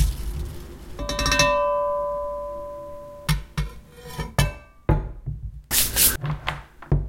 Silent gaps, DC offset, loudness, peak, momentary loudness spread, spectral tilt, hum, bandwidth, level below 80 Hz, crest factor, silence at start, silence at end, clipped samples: none; under 0.1%; -23 LUFS; -4 dBFS; 19 LU; -3.5 dB/octave; none; 16.5 kHz; -32 dBFS; 20 dB; 0 s; 0 s; under 0.1%